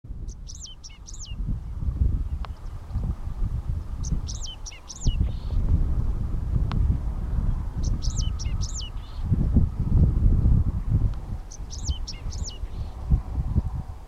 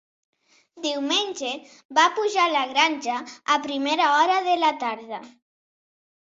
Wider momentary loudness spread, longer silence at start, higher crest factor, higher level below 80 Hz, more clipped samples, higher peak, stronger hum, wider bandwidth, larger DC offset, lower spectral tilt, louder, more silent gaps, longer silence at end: first, 15 LU vs 11 LU; second, 0.05 s vs 0.75 s; about the same, 18 dB vs 20 dB; first, -28 dBFS vs -76 dBFS; neither; about the same, -6 dBFS vs -6 dBFS; neither; about the same, 8.2 kHz vs 8 kHz; neither; first, -6 dB/octave vs -0.5 dB/octave; second, -28 LUFS vs -22 LUFS; second, none vs 1.85-1.89 s; second, 0 s vs 1.05 s